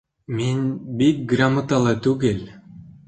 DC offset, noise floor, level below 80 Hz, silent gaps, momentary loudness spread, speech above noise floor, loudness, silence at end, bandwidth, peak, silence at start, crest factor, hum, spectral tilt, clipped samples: under 0.1%; -43 dBFS; -52 dBFS; none; 10 LU; 23 dB; -21 LUFS; 0.2 s; 9 kHz; -4 dBFS; 0.3 s; 16 dB; none; -6.5 dB/octave; under 0.1%